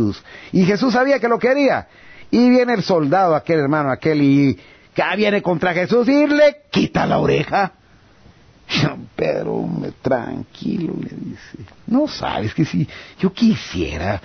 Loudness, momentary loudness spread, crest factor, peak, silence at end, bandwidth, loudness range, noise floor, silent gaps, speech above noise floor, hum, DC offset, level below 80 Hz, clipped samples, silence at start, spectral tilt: -18 LUFS; 11 LU; 12 dB; -4 dBFS; 0.05 s; 6.6 kHz; 7 LU; -49 dBFS; none; 31 dB; none; under 0.1%; -44 dBFS; under 0.1%; 0 s; -7 dB/octave